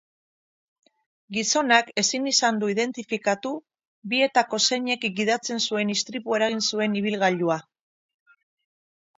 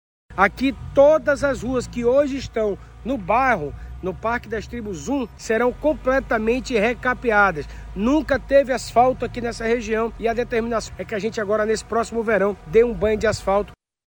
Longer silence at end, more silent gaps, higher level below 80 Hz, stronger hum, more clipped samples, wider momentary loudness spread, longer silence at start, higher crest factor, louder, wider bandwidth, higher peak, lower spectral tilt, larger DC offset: first, 1.55 s vs 0.35 s; first, 3.88-4.02 s vs none; second, -74 dBFS vs -40 dBFS; neither; neither; second, 7 LU vs 10 LU; first, 1.3 s vs 0.3 s; about the same, 22 dB vs 18 dB; about the same, -23 LUFS vs -21 LUFS; second, 8 kHz vs 19 kHz; about the same, -4 dBFS vs -2 dBFS; second, -2.5 dB/octave vs -5.5 dB/octave; neither